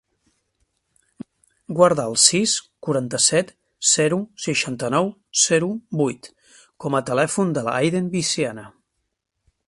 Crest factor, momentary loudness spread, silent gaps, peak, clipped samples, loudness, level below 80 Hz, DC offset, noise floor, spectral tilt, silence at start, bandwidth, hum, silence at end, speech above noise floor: 22 dB; 10 LU; none; 0 dBFS; under 0.1%; -20 LUFS; -62 dBFS; under 0.1%; -76 dBFS; -3 dB/octave; 1.7 s; 11.5 kHz; none; 1 s; 56 dB